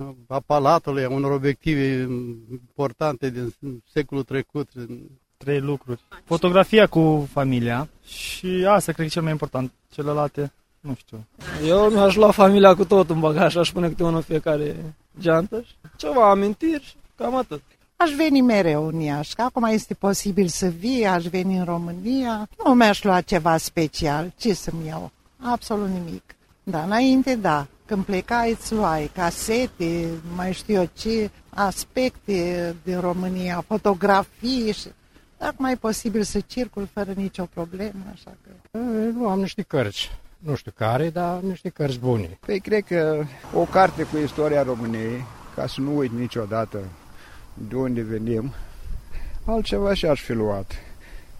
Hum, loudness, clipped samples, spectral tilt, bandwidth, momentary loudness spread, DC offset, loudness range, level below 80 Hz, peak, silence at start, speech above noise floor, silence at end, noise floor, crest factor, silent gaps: none; -22 LUFS; under 0.1%; -6 dB/octave; 16 kHz; 16 LU; under 0.1%; 9 LU; -42 dBFS; 0 dBFS; 0 s; 21 dB; 0 s; -42 dBFS; 22 dB; none